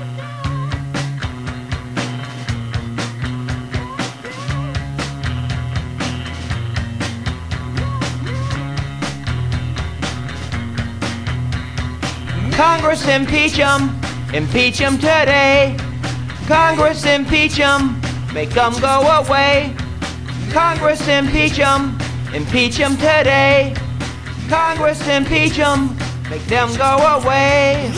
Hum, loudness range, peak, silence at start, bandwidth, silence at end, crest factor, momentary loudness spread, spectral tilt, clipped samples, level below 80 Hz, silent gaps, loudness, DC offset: none; 10 LU; 0 dBFS; 0 s; 11 kHz; 0 s; 16 dB; 12 LU; -5 dB/octave; under 0.1%; -32 dBFS; none; -17 LUFS; under 0.1%